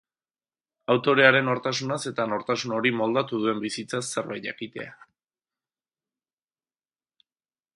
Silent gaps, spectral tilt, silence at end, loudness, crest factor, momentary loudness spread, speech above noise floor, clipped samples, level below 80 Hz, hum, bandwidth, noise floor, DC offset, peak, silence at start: none; -4.5 dB/octave; 2.8 s; -24 LUFS; 26 dB; 17 LU; over 65 dB; under 0.1%; -74 dBFS; none; 11.5 kHz; under -90 dBFS; under 0.1%; 0 dBFS; 0.9 s